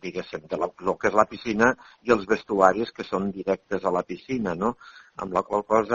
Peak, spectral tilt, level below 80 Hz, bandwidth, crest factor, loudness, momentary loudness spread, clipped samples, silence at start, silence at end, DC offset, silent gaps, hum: -2 dBFS; -4.5 dB/octave; -56 dBFS; 7.8 kHz; 24 dB; -25 LUFS; 12 LU; under 0.1%; 0.05 s; 0 s; under 0.1%; none; none